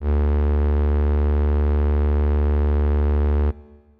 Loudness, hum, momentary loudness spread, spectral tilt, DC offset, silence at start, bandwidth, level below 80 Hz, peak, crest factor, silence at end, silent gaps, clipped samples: -21 LUFS; none; 1 LU; -11.5 dB/octave; under 0.1%; 0 s; 3.4 kHz; -20 dBFS; -16 dBFS; 4 dB; 0.4 s; none; under 0.1%